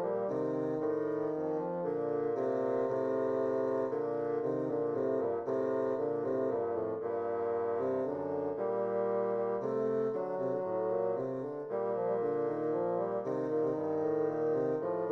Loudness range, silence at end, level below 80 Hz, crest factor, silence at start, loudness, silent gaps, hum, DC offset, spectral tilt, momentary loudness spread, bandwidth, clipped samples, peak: 1 LU; 0 s; -76 dBFS; 12 dB; 0 s; -34 LUFS; none; none; under 0.1%; -9.5 dB/octave; 3 LU; 6 kHz; under 0.1%; -22 dBFS